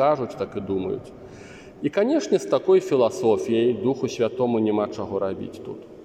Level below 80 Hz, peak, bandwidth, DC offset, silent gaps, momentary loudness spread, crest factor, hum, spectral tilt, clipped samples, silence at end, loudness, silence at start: -60 dBFS; -8 dBFS; 9.8 kHz; under 0.1%; none; 18 LU; 16 dB; none; -6 dB/octave; under 0.1%; 0 s; -23 LUFS; 0 s